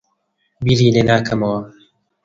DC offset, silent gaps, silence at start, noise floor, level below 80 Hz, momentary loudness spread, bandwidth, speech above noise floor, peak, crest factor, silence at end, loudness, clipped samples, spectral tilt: under 0.1%; none; 0.6 s; -67 dBFS; -44 dBFS; 10 LU; 7.6 kHz; 53 dB; 0 dBFS; 18 dB; 0.55 s; -16 LUFS; under 0.1%; -6.5 dB/octave